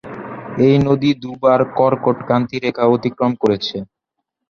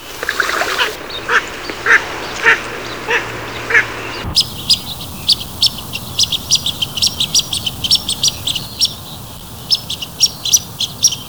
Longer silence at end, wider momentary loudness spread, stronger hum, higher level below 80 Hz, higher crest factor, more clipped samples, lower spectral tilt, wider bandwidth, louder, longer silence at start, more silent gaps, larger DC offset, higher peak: first, 0.65 s vs 0 s; about the same, 12 LU vs 12 LU; neither; second, -52 dBFS vs -40 dBFS; about the same, 16 dB vs 18 dB; neither; first, -8 dB/octave vs -0.5 dB/octave; second, 7 kHz vs over 20 kHz; about the same, -16 LUFS vs -15 LUFS; about the same, 0.05 s vs 0 s; neither; second, under 0.1% vs 0.9%; about the same, -2 dBFS vs 0 dBFS